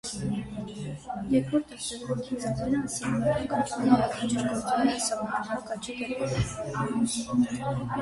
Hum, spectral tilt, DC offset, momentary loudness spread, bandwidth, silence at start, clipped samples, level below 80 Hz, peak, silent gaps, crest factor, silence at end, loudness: none; -5 dB/octave; under 0.1%; 10 LU; 11.5 kHz; 0.05 s; under 0.1%; -50 dBFS; -8 dBFS; none; 22 dB; 0 s; -29 LUFS